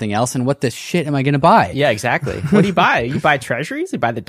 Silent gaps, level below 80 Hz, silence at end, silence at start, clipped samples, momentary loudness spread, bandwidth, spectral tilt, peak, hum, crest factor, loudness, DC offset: none; -46 dBFS; 0.05 s; 0 s; under 0.1%; 8 LU; 15 kHz; -5.5 dB/octave; -2 dBFS; none; 16 dB; -16 LUFS; under 0.1%